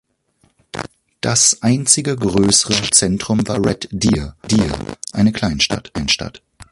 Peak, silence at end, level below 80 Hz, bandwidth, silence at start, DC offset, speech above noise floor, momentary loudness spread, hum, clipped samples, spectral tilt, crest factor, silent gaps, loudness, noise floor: 0 dBFS; 0.1 s; -38 dBFS; 12 kHz; 0.75 s; under 0.1%; 44 dB; 14 LU; none; under 0.1%; -3.5 dB/octave; 18 dB; none; -16 LUFS; -60 dBFS